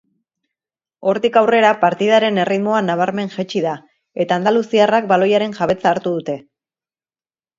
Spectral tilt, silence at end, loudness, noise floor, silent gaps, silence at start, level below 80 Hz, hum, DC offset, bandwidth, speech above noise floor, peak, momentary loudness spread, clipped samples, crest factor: -6 dB/octave; 1.2 s; -16 LUFS; under -90 dBFS; none; 1 s; -62 dBFS; none; under 0.1%; 7.6 kHz; over 74 dB; 0 dBFS; 10 LU; under 0.1%; 18 dB